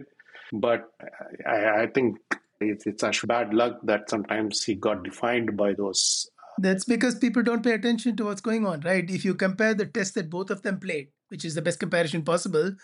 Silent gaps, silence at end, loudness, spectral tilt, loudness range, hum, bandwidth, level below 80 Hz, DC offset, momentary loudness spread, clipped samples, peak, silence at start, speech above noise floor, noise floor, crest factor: none; 0.05 s; -26 LUFS; -4 dB/octave; 3 LU; none; 11.5 kHz; -72 dBFS; under 0.1%; 9 LU; under 0.1%; -10 dBFS; 0 s; 23 dB; -49 dBFS; 16 dB